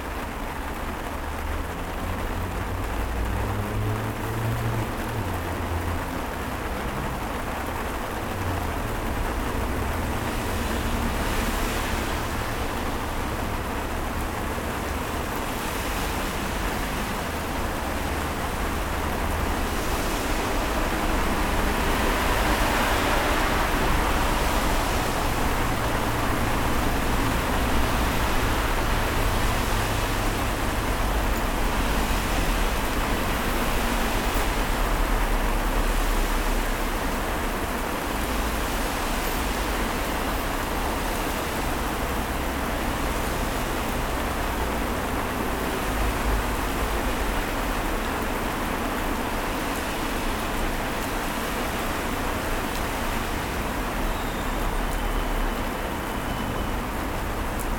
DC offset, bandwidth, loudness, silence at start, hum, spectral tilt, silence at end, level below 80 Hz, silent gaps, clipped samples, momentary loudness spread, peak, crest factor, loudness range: under 0.1%; 19.5 kHz; -27 LUFS; 0 s; none; -4.5 dB/octave; 0 s; -30 dBFS; none; under 0.1%; 5 LU; -10 dBFS; 16 dB; 5 LU